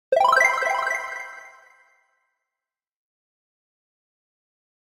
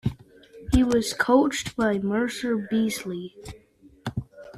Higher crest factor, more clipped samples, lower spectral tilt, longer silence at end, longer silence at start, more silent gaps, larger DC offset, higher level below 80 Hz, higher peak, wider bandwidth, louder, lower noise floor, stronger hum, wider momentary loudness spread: about the same, 22 dB vs 18 dB; neither; second, 0.5 dB/octave vs -5 dB/octave; first, 3.5 s vs 0 s; about the same, 0.1 s vs 0.05 s; neither; neither; second, -74 dBFS vs -42 dBFS; about the same, -6 dBFS vs -6 dBFS; first, 16 kHz vs 14 kHz; first, -20 LUFS vs -24 LUFS; first, -89 dBFS vs -49 dBFS; neither; about the same, 20 LU vs 18 LU